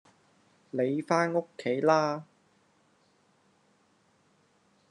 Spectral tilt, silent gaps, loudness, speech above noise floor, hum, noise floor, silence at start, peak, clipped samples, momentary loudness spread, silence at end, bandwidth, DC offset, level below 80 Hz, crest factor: -6 dB/octave; none; -29 LUFS; 40 dB; none; -68 dBFS; 0.75 s; -10 dBFS; under 0.1%; 9 LU; 2.65 s; 10.5 kHz; under 0.1%; -84 dBFS; 24 dB